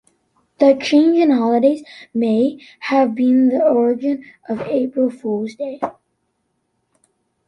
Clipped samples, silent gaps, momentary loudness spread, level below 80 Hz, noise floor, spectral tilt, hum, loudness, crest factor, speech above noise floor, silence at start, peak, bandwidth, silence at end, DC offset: under 0.1%; none; 13 LU; -66 dBFS; -70 dBFS; -6.5 dB/octave; none; -17 LUFS; 16 dB; 53 dB; 0.6 s; -2 dBFS; 9.6 kHz; 1.55 s; under 0.1%